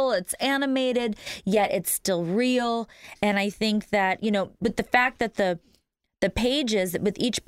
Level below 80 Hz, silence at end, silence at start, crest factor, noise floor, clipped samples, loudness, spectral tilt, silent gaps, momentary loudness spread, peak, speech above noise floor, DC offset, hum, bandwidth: -52 dBFS; 0.1 s; 0 s; 20 dB; -68 dBFS; under 0.1%; -25 LUFS; -4 dB/octave; none; 5 LU; -4 dBFS; 43 dB; under 0.1%; none; 16 kHz